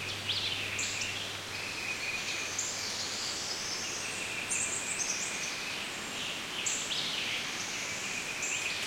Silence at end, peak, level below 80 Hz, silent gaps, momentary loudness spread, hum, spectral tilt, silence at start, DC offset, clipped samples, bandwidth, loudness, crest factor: 0 s; -18 dBFS; -66 dBFS; none; 4 LU; none; -0.5 dB/octave; 0 s; under 0.1%; under 0.1%; 16.5 kHz; -33 LUFS; 18 dB